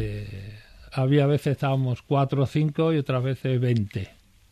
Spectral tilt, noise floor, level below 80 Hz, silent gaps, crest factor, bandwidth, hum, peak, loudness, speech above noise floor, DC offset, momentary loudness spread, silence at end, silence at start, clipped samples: -8.5 dB/octave; -43 dBFS; -50 dBFS; none; 16 dB; 13 kHz; none; -8 dBFS; -24 LUFS; 20 dB; under 0.1%; 14 LU; 0.45 s; 0 s; under 0.1%